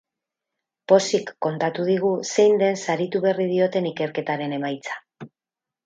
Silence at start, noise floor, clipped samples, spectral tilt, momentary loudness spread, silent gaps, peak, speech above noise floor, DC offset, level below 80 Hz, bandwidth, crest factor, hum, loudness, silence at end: 0.9 s; -89 dBFS; under 0.1%; -5 dB/octave; 10 LU; none; -2 dBFS; 68 dB; under 0.1%; -74 dBFS; 9.2 kHz; 22 dB; none; -22 LUFS; 0.6 s